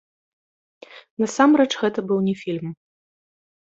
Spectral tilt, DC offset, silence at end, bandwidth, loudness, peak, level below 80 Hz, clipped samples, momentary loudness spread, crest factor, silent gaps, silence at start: -5.5 dB/octave; under 0.1%; 1 s; 8 kHz; -21 LUFS; -2 dBFS; -68 dBFS; under 0.1%; 15 LU; 20 dB; 1.10-1.17 s; 0.9 s